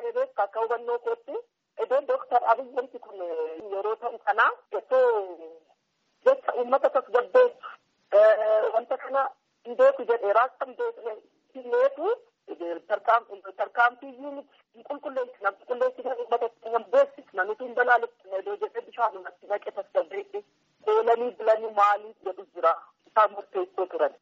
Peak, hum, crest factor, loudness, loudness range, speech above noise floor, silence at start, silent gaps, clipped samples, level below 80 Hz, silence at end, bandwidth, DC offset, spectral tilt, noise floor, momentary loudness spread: -8 dBFS; none; 18 dB; -26 LUFS; 5 LU; 46 dB; 0 s; none; under 0.1%; -86 dBFS; 0.1 s; 7.4 kHz; under 0.1%; 0.5 dB/octave; -72 dBFS; 16 LU